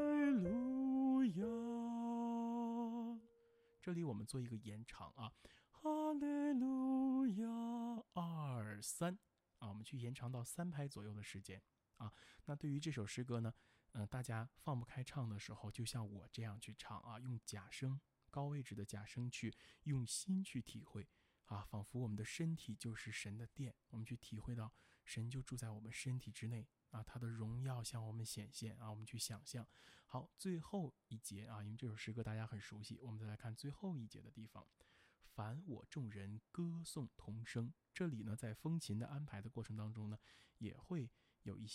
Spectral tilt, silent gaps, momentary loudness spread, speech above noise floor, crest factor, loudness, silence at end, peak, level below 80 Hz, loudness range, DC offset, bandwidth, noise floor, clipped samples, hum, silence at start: -6 dB/octave; none; 14 LU; 27 dB; 16 dB; -47 LUFS; 0 s; -30 dBFS; -72 dBFS; 8 LU; under 0.1%; 16 kHz; -74 dBFS; under 0.1%; none; 0 s